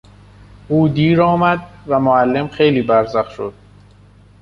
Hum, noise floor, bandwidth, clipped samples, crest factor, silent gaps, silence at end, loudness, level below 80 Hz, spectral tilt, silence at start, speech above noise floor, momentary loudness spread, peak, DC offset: 50 Hz at -40 dBFS; -45 dBFS; 7 kHz; under 0.1%; 14 dB; none; 0.9 s; -15 LUFS; -46 dBFS; -8.5 dB/octave; 0.7 s; 31 dB; 10 LU; -2 dBFS; under 0.1%